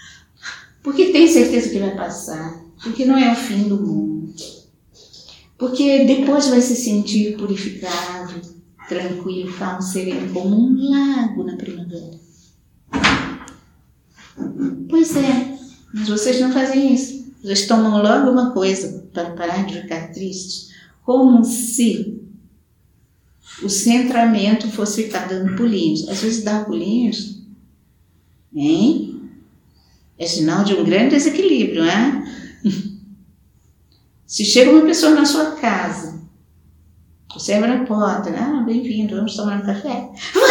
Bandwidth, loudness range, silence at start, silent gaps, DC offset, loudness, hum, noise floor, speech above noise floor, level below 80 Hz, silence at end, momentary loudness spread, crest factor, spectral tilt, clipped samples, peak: 18.5 kHz; 6 LU; 0.05 s; none; under 0.1%; -17 LUFS; none; -57 dBFS; 40 dB; -52 dBFS; 0 s; 16 LU; 18 dB; -4.5 dB/octave; under 0.1%; 0 dBFS